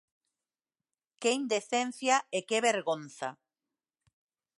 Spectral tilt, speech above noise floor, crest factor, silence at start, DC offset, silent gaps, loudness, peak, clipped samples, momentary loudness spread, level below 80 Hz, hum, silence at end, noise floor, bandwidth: -2 dB/octave; over 59 dB; 22 dB; 1.2 s; under 0.1%; none; -31 LUFS; -12 dBFS; under 0.1%; 11 LU; -88 dBFS; none; 1.25 s; under -90 dBFS; 11.5 kHz